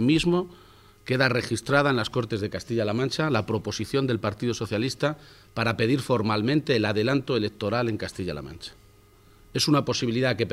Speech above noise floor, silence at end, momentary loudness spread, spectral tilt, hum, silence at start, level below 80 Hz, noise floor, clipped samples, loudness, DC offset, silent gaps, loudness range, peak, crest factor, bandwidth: 30 dB; 0 s; 11 LU; -5.5 dB/octave; none; 0 s; -52 dBFS; -55 dBFS; under 0.1%; -25 LUFS; under 0.1%; none; 2 LU; -6 dBFS; 20 dB; 15.5 kHz